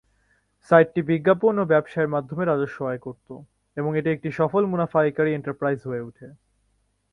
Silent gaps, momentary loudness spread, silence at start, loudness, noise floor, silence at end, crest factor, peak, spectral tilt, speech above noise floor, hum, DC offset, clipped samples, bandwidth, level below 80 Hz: none; 17 LU; 0.7 s; -23 LUFS; -69 dBFS; 0.8 s; 22 dB; -2 dBFS; -9 dB/octave; 46 dB; none; under 0.1%; under 0.1%; 6.4 kHz; -62 dBFS